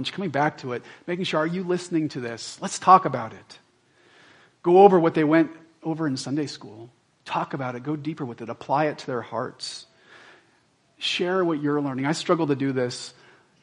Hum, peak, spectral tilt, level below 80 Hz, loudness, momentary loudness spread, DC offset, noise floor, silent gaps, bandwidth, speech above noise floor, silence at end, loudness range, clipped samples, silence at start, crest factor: none; 0 dBFS; -5.5 dB/octave; -72 dBFS; -24 LUFS; 17 LU; under 0.1%; -63 dBFS; none; 11 kHz; 40 dB; 0.5 s; 9 LU; under 0.1%; 0 s; 24 dB